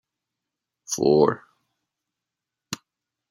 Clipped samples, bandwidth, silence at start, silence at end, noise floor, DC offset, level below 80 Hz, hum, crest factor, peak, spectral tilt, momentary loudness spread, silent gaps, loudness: under 0.1%; 15.5 kHz; 0.9 s; 0.55 s; -86 dBFS; under 0.1%; -64 dBFS; none; 22 dB; -4 dBFS; -5 dB/octave; 18 LU; none; -21 LUFS